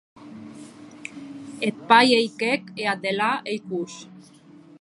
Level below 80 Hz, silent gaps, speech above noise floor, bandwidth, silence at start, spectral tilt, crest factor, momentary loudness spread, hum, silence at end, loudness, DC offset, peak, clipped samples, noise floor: -74 dBFS; none; 21 dB; 11.5 kHz; 0.2 s; -4 dB/octave; 24 dB; 25 LU; none; 0.6 s; -22 LUFS; under 0.1%; -2 dBFS; under 0.1%; -43 dBFS